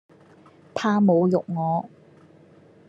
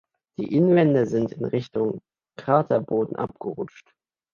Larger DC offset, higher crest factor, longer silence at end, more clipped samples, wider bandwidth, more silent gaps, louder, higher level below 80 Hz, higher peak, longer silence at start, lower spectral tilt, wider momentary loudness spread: neither; about the same, 18 dB vs 18 dB; first, 1 s vs 0.65 s; neither; about the same, 7.6 kHz vs 7 kHz; neither; about the same, -22 LUFS vs -23 LUFS; second, -70 dBFS vs -64 dBFS; second, -8 dBFS vs -4 dBFS; first, 0.75 s vs 0.4 s; about the same, -8 dB/octave vs -9 dB/octave; second, 14 LU vs 17 LU